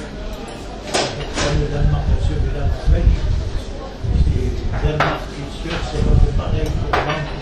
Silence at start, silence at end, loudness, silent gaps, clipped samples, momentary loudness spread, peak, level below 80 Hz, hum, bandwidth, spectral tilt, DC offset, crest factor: 0 s; 0 s; -21 LUFS; none; under 0.1%; 12 LU; -2 dBFS; -20 dBFS; none; 11 kHz; -5.5 dB/octave; under 0.1%; 16 dB